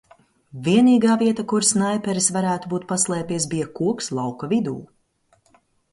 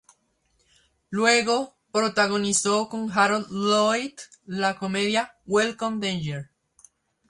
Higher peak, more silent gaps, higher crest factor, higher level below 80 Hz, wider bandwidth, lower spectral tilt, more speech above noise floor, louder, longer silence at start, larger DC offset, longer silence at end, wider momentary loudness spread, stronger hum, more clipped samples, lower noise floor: about the same, -4 dBFS vs -6 dBFS; neither; about the same, 18 dB vs 18 dB; about the same, -62 dBFS vs -64 dBFS; about the same, 11.5 kHz vs 11.5 kHz; about the same, -4.5 dB/octave vs -3.5 dB/octave; about the same, 43 dB vs 45 dB; first, -21 LUFS vs -24 LUFS; second, 0.55 s vs 1.1 s; neither; first, 1.1 s vs 0.85 s; about the same, 11 LU vs 11 LU; neither; neither; second, -63 dBFS vs -69 dBFS